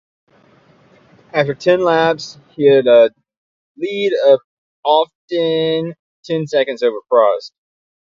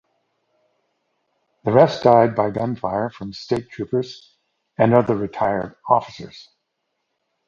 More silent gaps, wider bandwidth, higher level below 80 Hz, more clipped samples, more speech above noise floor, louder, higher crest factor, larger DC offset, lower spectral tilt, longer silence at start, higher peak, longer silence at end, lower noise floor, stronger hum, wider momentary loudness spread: first, 3.37-3.75 s, 4.44-4.83 s, 5.15-5.28 s, 5.99-6.23 s vs none; about the same, 7.4 kHz vs 7.4 kHz; second, -64 dBFS vs -56 dBFS; neither; second, 37 dB vs 56 dB; first, -15 LUFS vs -19 LUFS; second, 16 dB vs 22 dB; neither; second, -6 dB/octave vs -7.5 dB/octave; second, 1.35 s vs 1.65 s; about the same, 0 dBFS vs 0 dBFS; second, 0.7 s vs 1.05 s; second, -51 dBFS vs -75 dBFS; neither; second, 12 LU vs 20 LU